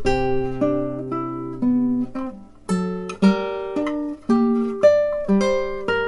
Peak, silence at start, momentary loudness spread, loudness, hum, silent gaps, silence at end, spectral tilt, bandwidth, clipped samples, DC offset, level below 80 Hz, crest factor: -4 dBFS; 0 s; 10 LU; -21 LUFS; none; none; 0 s; -7 dB/octave; 11.5 kHz; under 0.1%; under 0.1%; -42 dBFS; 16 dB